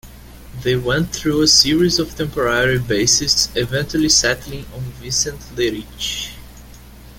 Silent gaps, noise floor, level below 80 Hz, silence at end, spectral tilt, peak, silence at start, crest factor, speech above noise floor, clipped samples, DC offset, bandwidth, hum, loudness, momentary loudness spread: none; -39 dBFS; -38 dBFS; 0 s; -3 dB/octave; 0 dBFS; 0.05 s; 18 dB; 21 dB; under 0.1%; under 0.1%; 17 kHz; none; -16 LUFS; 15 LU